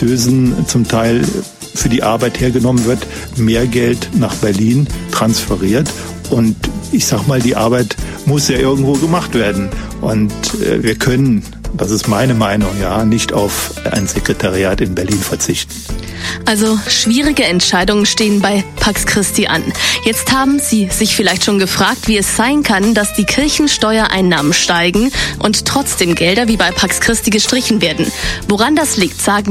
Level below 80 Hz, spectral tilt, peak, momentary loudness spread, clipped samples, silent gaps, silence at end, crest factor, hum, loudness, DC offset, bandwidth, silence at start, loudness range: -30 dBFS; -4 dB/octave; 0 dBFS; 6 LU; under 0.1%; none; 0 s; 12 dB; none; -13 LUFS; under 0.1%; 16.5 kHz; 0 s; 3 LU